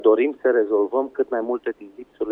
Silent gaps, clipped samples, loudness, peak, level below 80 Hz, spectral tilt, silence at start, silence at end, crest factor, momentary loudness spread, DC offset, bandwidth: none; under 0.1%; -22 LUFS; -6 dBFS; -66 dBFS; -7.5 dB/octave; 0 s; 0 s; 16 dB; 13 LU; under 0.1%; 3.8 kHz